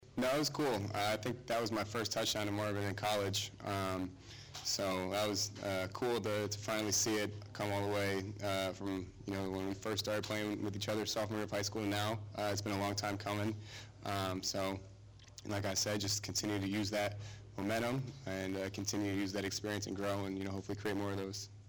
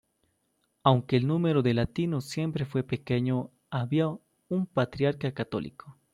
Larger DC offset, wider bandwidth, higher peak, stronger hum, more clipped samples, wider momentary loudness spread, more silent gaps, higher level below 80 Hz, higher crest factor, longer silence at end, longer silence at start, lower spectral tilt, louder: neither; first, over 20 kHz vs 12.5 kHz; second, -26 dBFS vs -8 dBFS; neither; neither; about the same, 7 LU vs 9 LU; neither; second, -66 dBFS vs -58 dBFS; second, 14 dB vs 22 dB; second, 0 s vs 0.2 s; second, 0 s vs 0.85 s; second, -4 dB/octave vs -7.5 dB/octave; second, -38 LUFS vs -29 LUFS